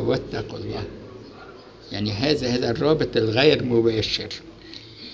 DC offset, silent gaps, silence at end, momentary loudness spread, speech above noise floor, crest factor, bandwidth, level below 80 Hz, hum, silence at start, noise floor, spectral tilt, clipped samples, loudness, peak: under 0.1%; none; 0 s; 23 LU; 21 dB; 20 dB; 8 kHz; -46 dBFS; none; 0 s; -43 dBFS; -6 dB/octave; under 0.1%; -22 LUFS; -4 dBFS